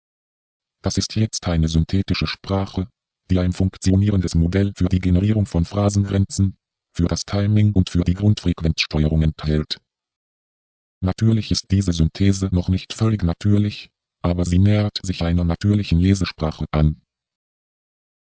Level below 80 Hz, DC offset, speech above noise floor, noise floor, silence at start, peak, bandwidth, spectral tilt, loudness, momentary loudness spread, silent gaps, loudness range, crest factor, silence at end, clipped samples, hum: -30 dBFS; under 0.1%; over 71 dB; under -90 dBFS; 0.85 s; -4 dBFS; 8 kHz; -6.5 dB/octave; -20 LUFS; 7 LU; 10.16-11.01 s; 3 LU; 16 dB; 1.35 s; under 0.1%; none